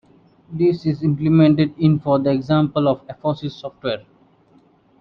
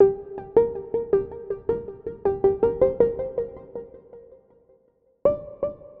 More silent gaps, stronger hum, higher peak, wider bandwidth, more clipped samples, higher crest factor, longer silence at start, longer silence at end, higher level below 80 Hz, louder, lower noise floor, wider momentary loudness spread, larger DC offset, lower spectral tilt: neither; neither; about the same, -4 dBFS vs -6 dBFS; first, 5.8 kHz vs 3.5 kHz; neither; about the same, 16 dB vs 20 dB; first, 0.5 s vs 0 s; first, 1 s vs 0.15 s; about the same, -52 dBFS vs -50 dBFS; first, -19 LUFS vs -25 LUFS; second, -55 dBFS vs -63 dBFS; about the same, 13 LU vs 14 LU; neither; second, -9.5 dB/octave vs -11 dB/octave